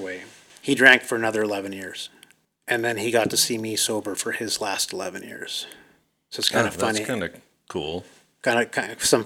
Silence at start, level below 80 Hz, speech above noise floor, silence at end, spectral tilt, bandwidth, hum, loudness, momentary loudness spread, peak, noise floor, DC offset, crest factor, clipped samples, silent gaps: 0 s; -62 dBFS; 33 dB; 0 s; -2.5 dB/octave; 19 kHz; none; -23 LUFS; 16 LU; -2 dBFS; -57 dBFS; under 0.1%; 22 dB; under 0.1%; none